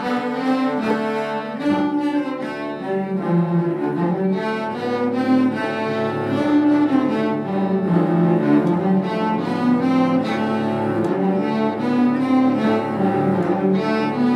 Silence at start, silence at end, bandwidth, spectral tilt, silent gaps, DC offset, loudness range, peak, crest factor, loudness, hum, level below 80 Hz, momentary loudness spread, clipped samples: 0 s; 0 s; 10.5 kHz; -8 dB/octave; none; under 0.1%; 3 LU; -6 dBFS; 14 dB; -20 LUFS; none; -62 dBFS; 6 LU; under 0.1%